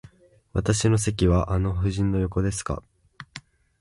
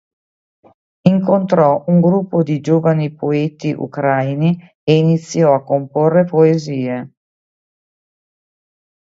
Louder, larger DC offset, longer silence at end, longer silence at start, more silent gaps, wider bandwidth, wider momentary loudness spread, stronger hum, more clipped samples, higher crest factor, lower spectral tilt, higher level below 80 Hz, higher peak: second, -24 LUFS vs -15 LUFS; neither; second, 0.4 s vs 1.95 s; second, 0.55 s vs 1.05 s; second, none vs 4.75-4.87 s; first, 11.5 kHz vs 7.8 kHz; first, 20 LU vs 8 LU; neither; neither; about the same, 18 dB vs 16 dB; second, -6 dB/octave vs -8 dB/octave; first, -36 dBFS vs -62 dBFS; second, -8 dBFS vs 0 dBFS